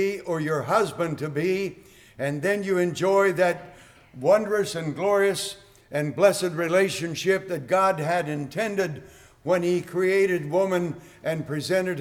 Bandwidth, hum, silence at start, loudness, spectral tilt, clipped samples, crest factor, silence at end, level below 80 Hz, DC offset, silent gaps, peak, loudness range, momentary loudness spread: 17 kHz; none; 0 s; -24 LUFS; -5 dB/octave; under 0.1%; 18 dB; 0 s; -62 dBFS; under 0.1%; none; -6 dBFS; 2 LU; 9 LU